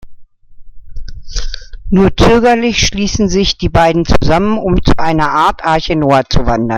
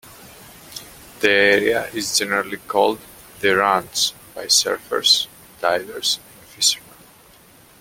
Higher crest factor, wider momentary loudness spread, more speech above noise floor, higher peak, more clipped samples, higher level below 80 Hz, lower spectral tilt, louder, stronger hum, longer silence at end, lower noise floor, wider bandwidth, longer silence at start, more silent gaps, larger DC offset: second, 12 dB vs 22 dB; about the same, 12 LU vs 14 LU; second, 22 dB vs 30 dB; about the same, 0 dBFS vs 0 dBFS; neither; first, -22 dBFS vs -58 dBFS; first, -5 dB/octave vs -1 dB/octave; first, -11 LUFS vs -18 LUFS; neither; second, 0 s vs 1 s; second, -32 dBFS vs -49 dBFS; second, 10.5 kHz vs 17 kHz; about the same, 0.05 s vs 0.05 s; neither; neither